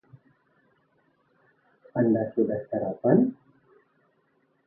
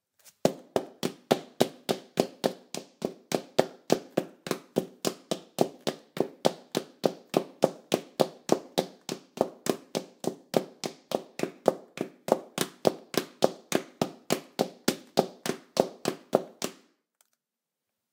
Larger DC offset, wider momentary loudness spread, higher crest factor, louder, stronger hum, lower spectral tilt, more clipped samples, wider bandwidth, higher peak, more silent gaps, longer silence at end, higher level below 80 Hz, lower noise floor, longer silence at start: neither; about the same, 8 LU vs 9 LU; second, 22 dB vs 28 dB; first, -25 LUFS vs -31 LUFS; neither; first, -14 dB/octave vs -4.5 dB/octave; neither; second, 2.1 kHz vs 18 kHz; second, -6 dBFS vs -2 dBFS; neither; about the same, 1.35 s vs 1.4 s; about the same, -68 dBFS vs -72 dBFS; second, -69 dBFS vs -88 dBFS; first, 1.95 s vs 0.45 s